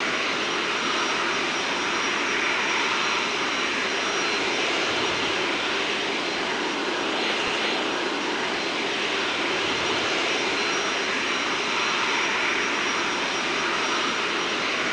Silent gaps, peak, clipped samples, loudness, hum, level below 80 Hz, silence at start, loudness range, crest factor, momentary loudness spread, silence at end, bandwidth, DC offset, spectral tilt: none; -12 dBFS; under 0.1%; -23 LUFS; none; -60 dBFS; 0 s; 1 LU; 14 dB; 3 LU; 0 s; 11 kHz; under 0.1%; -1.5 dB/octave